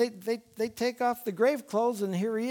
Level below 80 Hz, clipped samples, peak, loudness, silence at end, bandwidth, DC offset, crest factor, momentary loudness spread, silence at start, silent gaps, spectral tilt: -74 dBFS; under 0.1%; -14 dBFS; -30 LUFS; 0 s; 19.5 kHz; under 0.1%; 14 dB; 7 LU; 0 s; none; -5.5 dB/octave